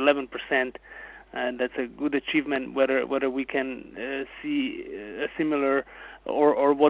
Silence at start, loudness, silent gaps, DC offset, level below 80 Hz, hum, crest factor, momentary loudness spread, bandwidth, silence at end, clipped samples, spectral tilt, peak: 0 s; -27 LUFS; none; under 0.1%; -60 dBFS; none; 20 dB; 13 LU; 4 kHz; 0 s; under 0.1%; -8.5 dB/octave; -6 dBFS